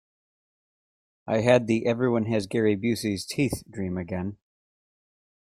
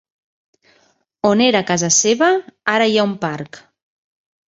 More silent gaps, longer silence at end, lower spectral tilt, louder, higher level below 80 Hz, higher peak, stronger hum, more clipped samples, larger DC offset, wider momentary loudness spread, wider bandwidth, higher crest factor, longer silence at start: neither; first, 1.05 s vs 0.9 s; first, -6 dB/octave vs -3 dB/octave; second, -26 LUFS vs -16 LUFS; about the same, -58 dBFS vs -62 dBFS; about the same, -4 dBFS vs -2 dBFS; neither; neither; neither; about the same, 11 LU vs 11 LU; first, 15.5 kHz vs 8 kHz; about the same, 22 dB vs 18 dB; about the same, 1.25 s vs 1.25 s